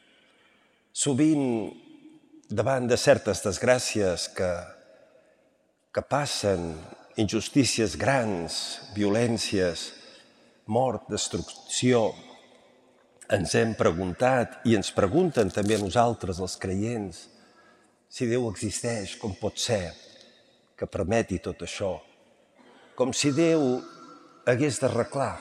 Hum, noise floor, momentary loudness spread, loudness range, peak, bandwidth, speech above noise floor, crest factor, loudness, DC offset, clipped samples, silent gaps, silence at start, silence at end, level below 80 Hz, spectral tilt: none; -67 dBFS; 12 LU; 6 LU; -6 dBFS; 14.5 kHz; 42 dB; 22 dB; -26 LUFS; under 0.1%; under 0.1%; none; 0.95 s; 0 s; -58 dBFS; -4.5 dB/octave